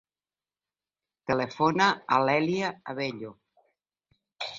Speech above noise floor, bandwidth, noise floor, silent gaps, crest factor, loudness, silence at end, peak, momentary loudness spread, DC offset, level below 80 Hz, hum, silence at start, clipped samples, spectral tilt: over 63 dB; 7.6 kHz; under -90 dBFS; none; 22 dB; -26 LUFS; 0 s; -6 dBFS; 17 LU; under 0.1%; -68 dBFS; 50 Hz at -60 dBFS; 1.3 s; under 0.1%; -5 dB/octave